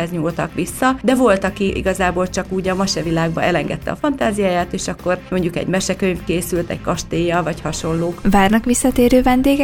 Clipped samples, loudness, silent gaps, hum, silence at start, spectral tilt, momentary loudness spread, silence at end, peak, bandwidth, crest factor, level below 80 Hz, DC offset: under 0.1%; -18 LUFS; none; none; 0 s; -5 dB/octave; 8 LU; 0 s; 0 dBFS; 17.5 kHz; 18 dB; -34 dBFS; under 0.1%